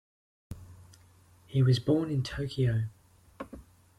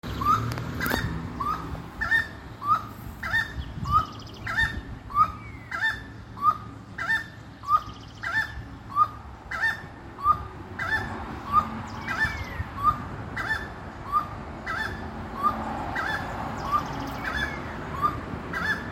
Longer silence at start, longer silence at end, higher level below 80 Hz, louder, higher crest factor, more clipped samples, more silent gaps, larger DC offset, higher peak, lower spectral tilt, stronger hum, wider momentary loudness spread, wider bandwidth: first, 0.5 s vs 0.05 s; first, 0.35 s vs 0 s; second, -54 dBFS vs -42 dBFS; about the same, -29 LUFS vs -28 LUFS; second, 16 dB vs 22 dB; neither; neither; neither; second, -14 dBFS vs -6 dBFS; first, -7.5 dB/octave vs -5 dB/octave; neither; first, 22 LU vs 12 LU; second, 11.5 kHz vs 16.5 kHz